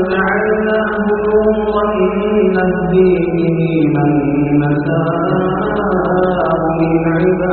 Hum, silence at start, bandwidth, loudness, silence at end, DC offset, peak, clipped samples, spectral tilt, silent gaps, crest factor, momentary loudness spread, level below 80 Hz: none; 0 s; 4.4 kHz; -14 LUFS; 0 s; under 0.1%; -2 dBFS; under 0.1%; -7 dB/octave; none; 12 dB; 3 LU; -36 dBFS